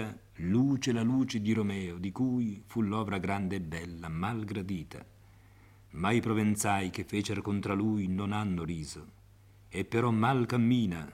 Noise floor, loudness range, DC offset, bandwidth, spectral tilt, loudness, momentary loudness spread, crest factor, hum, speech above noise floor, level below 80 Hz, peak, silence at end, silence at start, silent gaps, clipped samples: -57 dBFS; 4 LU; under 0.1%; 15.5 kHz; -6 dB/octave; -32 LUFS; 12 LU; 18 dB; none; 27 dB; -60 dBFS; -14 dBFS; 0 s; 0 s; none; under 0.1%